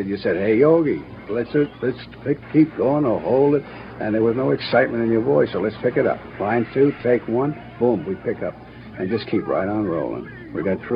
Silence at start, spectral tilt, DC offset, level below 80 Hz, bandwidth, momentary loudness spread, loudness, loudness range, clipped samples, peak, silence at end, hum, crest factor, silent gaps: 0 s; -10.5 dB/octave; under 0.1%; -52 dBFS; 5.4 kHz; 11 LU; -21 LUFS; 4 LU; under 0.1%; -2 dBFS; 0 s; none; 18 dB; none